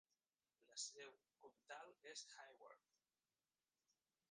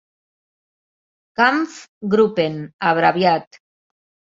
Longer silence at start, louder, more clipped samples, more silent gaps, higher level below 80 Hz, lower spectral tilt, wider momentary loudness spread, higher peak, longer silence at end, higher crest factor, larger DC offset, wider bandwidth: second, 0.6 s vs 1.4 s; second, -57 LUFS vs -18 LUFS; neither; second, none vs 1.89-2.01 s, 2.73-2.79 s; second, under -90 dBFS vs -64 dBFS; second, 1.5 dB/octave vs -6 dB/octave; about the same, 13 LU vs 11 LU; second, -36 dBFS vs -2 dBFS; first, 1.5 s vs 0.85 s; first, 26 dB vs 20 dB; neither; first, 9.6 kHz vs 7.8 kHz